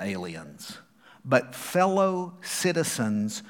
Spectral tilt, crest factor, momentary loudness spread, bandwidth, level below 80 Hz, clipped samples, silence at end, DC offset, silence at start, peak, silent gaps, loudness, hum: -4.5 dB/octave; 22 dB; 18 LU; 18.5 kHz; -74 dBFS; under 0.1%; 0 s; under 0.1%; 0 s; -6 dBFS; none; -26 LUFS; none